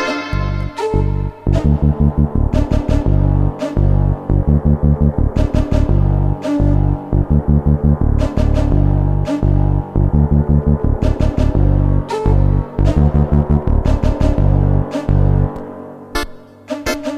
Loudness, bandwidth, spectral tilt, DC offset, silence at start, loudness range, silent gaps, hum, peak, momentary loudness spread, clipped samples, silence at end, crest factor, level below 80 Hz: -16 LUFS; 12.5 kHz; -8.5 dB/octave; under 0.1%; 0 s; 1 LU; none; none; -2 dBFS; 6 LU; under 0.1%; 0 s; 12 dB; -18 dBFS